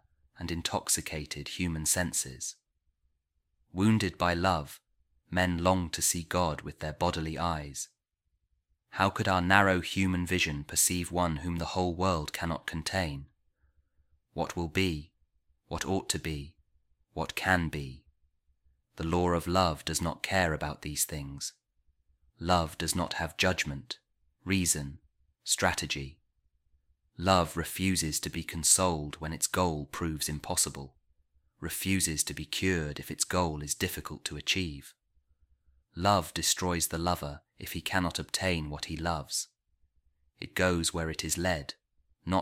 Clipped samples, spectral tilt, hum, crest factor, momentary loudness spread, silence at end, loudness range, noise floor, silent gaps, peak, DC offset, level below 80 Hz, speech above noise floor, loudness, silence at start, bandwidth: under 0.1%; -3.5 dB/octave; none; 26 dB; 13 LU; 0 s; 6 LU; -80 dBFS; none; -6 dBFS; under 0.1%; -50 dBFS; 50 dB; -30 LUFS; 0.4 s; 16.5 kHz